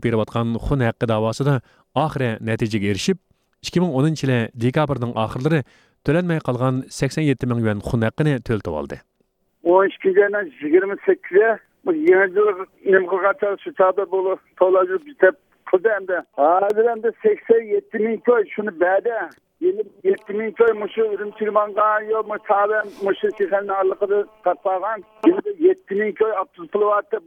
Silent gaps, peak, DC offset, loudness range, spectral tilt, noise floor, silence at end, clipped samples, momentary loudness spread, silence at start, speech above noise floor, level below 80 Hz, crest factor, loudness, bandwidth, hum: none; 0 dBFS; under 0.1%; 3 LU; -7 dB/octave; -67 dBFS; 0.05 s; under 0.1%; 7 LU; 0 s; 48 dB; -48 dBFS; 20 dB; -20 LUFS; 12 kHz; none